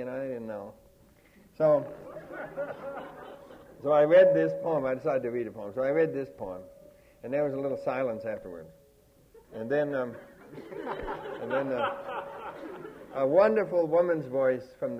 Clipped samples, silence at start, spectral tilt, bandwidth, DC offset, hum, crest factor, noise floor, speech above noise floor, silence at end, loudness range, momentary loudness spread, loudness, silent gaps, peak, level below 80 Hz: under 0.1%; 0 s; -7.5 dB/octave; 6.2 kHz; under 0.1%; none; 18 dB; -61 dBFS; 32 dB; 0 s; 9 LU; 21 LU; -28 LUFS; none; -10 dBFS; -62 dBFS